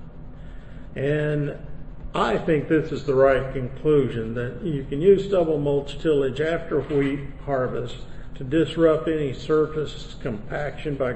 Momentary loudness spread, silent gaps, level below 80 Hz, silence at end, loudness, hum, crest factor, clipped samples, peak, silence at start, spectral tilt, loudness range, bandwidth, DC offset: 19 LU; none; -40 dBFS; 0 s; -23 LUFS; none; 18 dB; under 0.1%; -6 dBFS; 0 s; -7.5 dB/octave; 3 LU; 8.6 kHz; under 0.1%